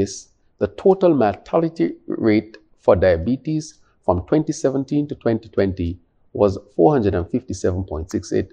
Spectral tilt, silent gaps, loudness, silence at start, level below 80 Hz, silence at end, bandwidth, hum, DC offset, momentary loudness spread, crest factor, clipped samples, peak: -7 dB/octave; none; -20 LUFS; 0 s; -42 dBFS; 0.05 s; 9.8 kHz; none; under 0.1%; 11 LU; 20 dB; under 0.1%; 0 dBFS